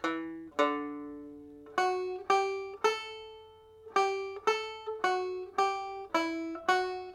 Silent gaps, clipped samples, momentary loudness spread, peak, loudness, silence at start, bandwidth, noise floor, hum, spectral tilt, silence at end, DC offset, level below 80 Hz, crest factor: none; under 0.1%; 14 LU; -12 dBFS; -32 LUFS; 0 s; 14 kHz; -54 dBFS; none; -2.5 dB/octave; 0 s; under 0.1%; -72 dBFS; 20 dB